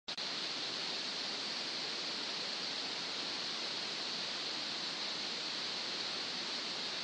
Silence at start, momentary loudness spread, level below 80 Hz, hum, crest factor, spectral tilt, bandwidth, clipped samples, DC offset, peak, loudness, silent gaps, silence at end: 0.1 s; 0 LU; -88 dBFS; none; 14 dB; -1 dB/octave; 10 kHz; under 0.1%; under 0.1%; -26 dBFS; -37 LUFS; none; 0 s